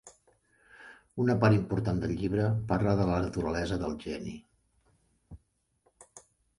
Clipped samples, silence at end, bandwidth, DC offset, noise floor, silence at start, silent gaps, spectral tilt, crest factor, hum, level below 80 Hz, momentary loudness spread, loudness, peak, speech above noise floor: under 0.1%; 0.4 s; 11.5 kHz; under 0.1%; -72 dBFS; 0.05 s; none; -7.5 dB/octave; 22 dB; none; -48 dBFS; 18 LU; -30 LUFS; -10 dBFS; 44 dB